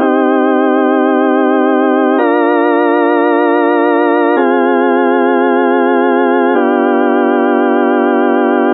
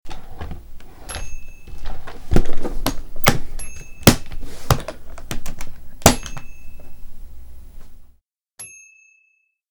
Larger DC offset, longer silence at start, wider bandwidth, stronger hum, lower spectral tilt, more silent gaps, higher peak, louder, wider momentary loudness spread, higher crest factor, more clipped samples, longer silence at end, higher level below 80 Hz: neither; about the same, 0 s vs 0.05 s; second, 4 kHz vs over 20 kHz; neither; first, -9.5 dB/octave vs -4 dB/octave; neither; about the same, 0 dBFS vs 0 dBFS; first, -11 LUFS vs -21 LUFS; second, 0 LU vs 25 LU; second, 10 dB vs 20 dB; neither; second, 0 s vs 1 s; second, -82 dBFS vs -28 dBFS